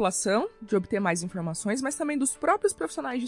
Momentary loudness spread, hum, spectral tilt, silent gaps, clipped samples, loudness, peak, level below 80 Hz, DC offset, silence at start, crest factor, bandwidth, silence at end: 6 LU; none; -4 dB/octave; none; under 0.1%; -27 LUFS; -10 dBFS; -62 dBFS; under 0.1%; 0 s; 18 dB; 12 kHz; 0 s